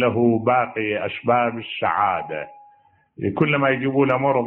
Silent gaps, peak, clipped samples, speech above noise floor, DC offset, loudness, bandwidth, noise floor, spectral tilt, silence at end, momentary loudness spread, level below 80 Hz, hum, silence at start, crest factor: none; -6 dBFS; under 0.1%; 35 dB; under 0.1%; -21 LUFS; 4.2 kHz; -56 dBFS; -5 dB/octave; 0 s; 9 LU; -60 dBFS; none; 0 s; 16 dB